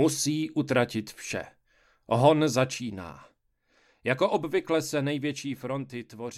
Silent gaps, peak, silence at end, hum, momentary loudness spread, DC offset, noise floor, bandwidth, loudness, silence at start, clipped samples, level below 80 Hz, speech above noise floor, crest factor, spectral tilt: none; -6 dBFS; 0 s; none; 15 LU; under 0.1%; -69 dBFS; 15 kHz; -28 LUFS; 0 s; under 0.1%; -66 dBFS; 42 dB; 22 dB; -5 dB/octave